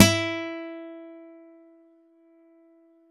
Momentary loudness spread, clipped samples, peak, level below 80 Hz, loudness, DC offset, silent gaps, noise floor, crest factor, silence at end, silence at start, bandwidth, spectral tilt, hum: 25 LU; under 0.1%; 0 dBFS; -66 dBFS; -26 LUFS; under 0.1%; none; -58 dBFS; 28 dB; 1.85 s; 0 s; 12.5 kHz; -3.5 dB/octave; none